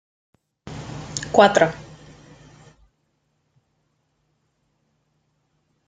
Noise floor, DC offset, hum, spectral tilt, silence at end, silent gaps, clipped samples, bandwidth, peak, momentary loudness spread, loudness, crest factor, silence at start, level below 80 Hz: -70 dBFS; under 0.1%; none; -4 dB/octave; 4.1 s; none; under 0.1%; 9.4 kHz; -2 dBFS; 24 LU; -18 LUFS; 24 dB; 0.65 s; -56 dBFS